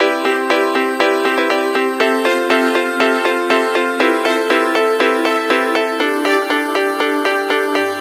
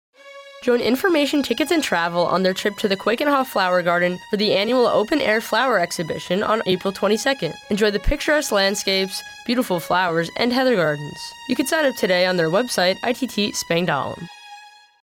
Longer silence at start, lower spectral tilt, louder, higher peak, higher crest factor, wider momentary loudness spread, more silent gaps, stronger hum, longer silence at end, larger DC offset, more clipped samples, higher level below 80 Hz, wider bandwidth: second, 0 s vs 0.25 s; second, -2 dB/octave vs -4 dB/octave; first, -15 LUFS vs -20 LUFS; first, 0 dBFS vs -8 dBFS; about the same, 14 dB vs 14 dB; second, 2 LU vs 7 LU; neither; neither; second, 0 s vs 0.35 s; neither; neither; second, -72 dBFS vs -40 dBFS; second, 16 kHz vs 19.5 kHz